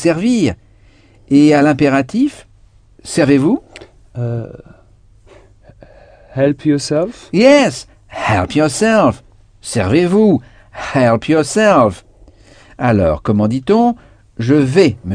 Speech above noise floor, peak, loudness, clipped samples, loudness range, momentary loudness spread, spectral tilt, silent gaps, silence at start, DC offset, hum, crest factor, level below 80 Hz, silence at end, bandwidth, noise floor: 34 dB; 0 dBFS; -13 LUFS; under 0.1%; 6 LU; 16 LU; -6 dB/octave; none; 0 s; under 0.1%; none; 14 dB; -42 dBFS; 0 s; 10 kHz; -46 dBFS